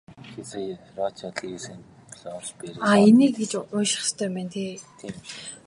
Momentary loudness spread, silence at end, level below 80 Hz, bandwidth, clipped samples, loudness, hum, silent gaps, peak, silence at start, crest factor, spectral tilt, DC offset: 22 LU; 0.1 s; -66 dBFS; 11.5 kHz; under 0.1%; -23 LUFS; none; none; -4 dBFS; 0.1 s; 20 dB; -4.5 dB/octave; under 0.1%